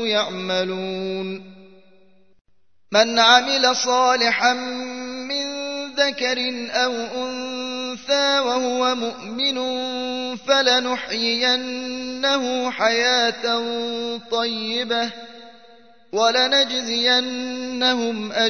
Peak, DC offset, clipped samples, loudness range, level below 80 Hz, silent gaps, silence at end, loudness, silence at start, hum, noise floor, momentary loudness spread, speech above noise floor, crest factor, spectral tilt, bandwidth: 0 dBFS; 0.3%; under 0.1%; 5 LU; -66 dBFS; 2.41-2.45 s; 0 s; -20 LUFS; 0 s; none; -57 dBFS; 11 LU; 37 dB; 22 dB; -2 dB/octave; 6.6 kHz